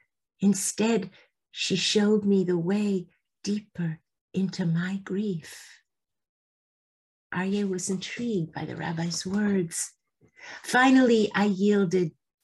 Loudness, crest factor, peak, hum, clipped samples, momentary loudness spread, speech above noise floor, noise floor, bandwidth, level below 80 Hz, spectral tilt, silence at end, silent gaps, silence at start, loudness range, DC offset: -26 LUFS; 18 dB; -10 dBFS; none; under 0.1%; 13 LU; over 64 dB; under -90 dBFS; 12.5 kHz; -68 dBFS; -5 dB/octave; 0.35 s; 4.21-4.28 s, 6.29-7.30 s; 0.4 s; 9 LU; under 0.1%